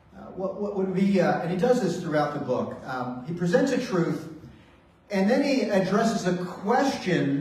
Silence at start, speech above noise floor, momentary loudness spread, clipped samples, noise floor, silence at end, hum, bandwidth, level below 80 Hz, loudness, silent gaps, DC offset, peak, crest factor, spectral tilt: 0.15 s; 30 dB; 10 LU; under 0.1%; -55 dBFS; 0 s; none; 14 kHz; -60 dBFS; -25 LUFS; none; under 0.1%; -8 dBFS; 18 dB; -6.5 dB/octave